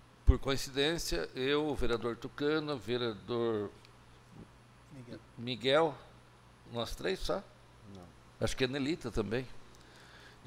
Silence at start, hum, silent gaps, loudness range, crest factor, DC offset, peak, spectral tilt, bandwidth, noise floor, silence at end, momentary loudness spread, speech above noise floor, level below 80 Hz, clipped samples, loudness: 0.25 s; none; none; 4 LU; 24 dB; under 0.1%; -10 dBFS; -5 dB/octave; 16 kHz; -59 dBFS; 0.1 s; 23 LU; 25 dB; -42 dBFS; under 0.1%; -35 LUFS